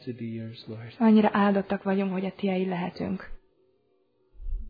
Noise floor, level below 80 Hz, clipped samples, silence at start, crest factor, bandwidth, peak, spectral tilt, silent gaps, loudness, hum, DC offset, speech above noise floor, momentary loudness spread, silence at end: -69 dBFS; -44 dBFS; under 0.1%; 0.05 s; 18 dB; 5 kHz; -10 dBFS; -10 dB/octave; none; -26 LUFS; none; under 0.1%; 43 dB; 20 LU; 0 s